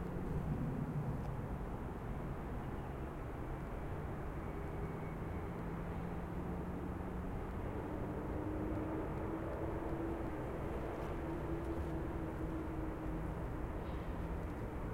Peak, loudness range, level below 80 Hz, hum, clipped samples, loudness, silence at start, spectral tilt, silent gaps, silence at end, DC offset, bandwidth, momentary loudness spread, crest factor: -28 dBFS; 3 LU; -48 dBFS; none; under 0.1%; -43 LUFS; 0 s; -8.5 dB/octave; none; 0 s; under 0.1%; 16.5 kHz; 4 LU; 14 dB